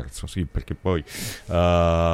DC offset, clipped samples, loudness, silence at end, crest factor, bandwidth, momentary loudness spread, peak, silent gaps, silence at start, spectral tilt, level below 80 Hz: under 0.1%; under 0.1%; -24 LUFS; 0 s; 14 dB; 16 kHz; 13 LU; -8 dBFS; none; 0 s; -6 dB/octave; -34 dBFS